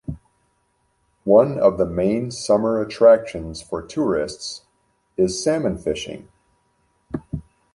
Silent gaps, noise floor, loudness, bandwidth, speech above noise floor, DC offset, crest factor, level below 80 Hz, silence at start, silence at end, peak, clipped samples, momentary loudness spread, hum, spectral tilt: none; -67 dBFS; -20 LUFS; 11.5 kHz; 48 dB; under 0.1%; 18 dB; -46 dBFS; 0.1 s; 0.35 s; -2 dBFS; under 0.1%; 20 LU; none; -5.5 dB/octave